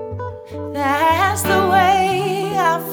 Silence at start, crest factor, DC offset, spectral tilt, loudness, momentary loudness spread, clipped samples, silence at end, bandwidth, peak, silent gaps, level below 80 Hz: 0 s; 14 dB; under 0.1%; -4.5 dB/octave; -16 LUFS; 15 LU; under 0.1%; 0 s; over 20 kHz; -4 dBFS; none; -48 dBFS